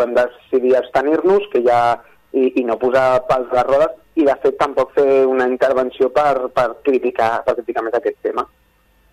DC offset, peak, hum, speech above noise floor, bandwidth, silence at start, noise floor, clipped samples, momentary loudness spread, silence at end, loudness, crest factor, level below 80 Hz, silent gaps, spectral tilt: under 0.1%; -4 dBFS; none; 40 dB; 11.5 kHz; 0 s; -56 dBFS; under 0.1%; 6 LU; 0.65 s; -17 LUFS; 14 dB; -50 dBFS; none; -6 dB/octave